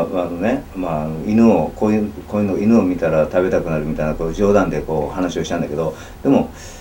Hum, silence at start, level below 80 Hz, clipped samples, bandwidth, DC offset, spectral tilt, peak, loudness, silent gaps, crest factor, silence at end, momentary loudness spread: none; 0 s; -36 dBFS; under 0.1%; 17 kHz; under 0.1%; -7.5 dB/octave; 0 dBFS; -18 LUFS; none; 18 dB; 0 s; 8 LU